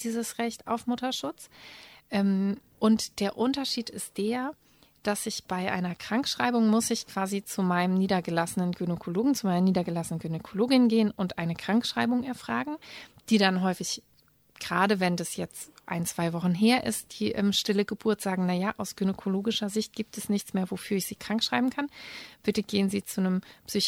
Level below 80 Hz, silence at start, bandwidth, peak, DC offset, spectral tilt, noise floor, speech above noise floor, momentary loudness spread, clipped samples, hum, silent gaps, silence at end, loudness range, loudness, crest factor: -64 dBFS; 0 s; 16.5 kHz; -6 dBFS; under 0.1%; -5 dB/octave; -62 dBFS; 34 dB; 11 LU; under 0.1%; none; none; 0 s; 3 LU; -28 LUFS; 22 dB